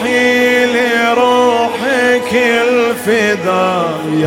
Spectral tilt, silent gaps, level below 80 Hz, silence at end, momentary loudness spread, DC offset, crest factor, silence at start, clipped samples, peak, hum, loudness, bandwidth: -4 dB/octave; none; -56 dBFS; 0 s; 4 LU; under 0.1%; 12 dB; 0 s; under 0.1%; 0 dBFS; none; -12 LUFS; 16.5 kHz